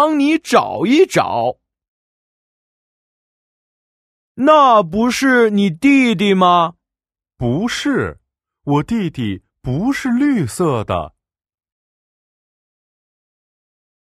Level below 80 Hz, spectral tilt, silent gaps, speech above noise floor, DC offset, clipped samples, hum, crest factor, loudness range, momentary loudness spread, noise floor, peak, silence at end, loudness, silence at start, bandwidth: -48 dBFS; -5.5 dB/octave; 1.88-4.35 s; 76 dB; under 0.1%; under 0.1%; none; 18 dB; 11 LU; 12 LU; -90 dBFS; 0 dBFS; 3 s; -15 LUFS; 0 s; 14.5 kHz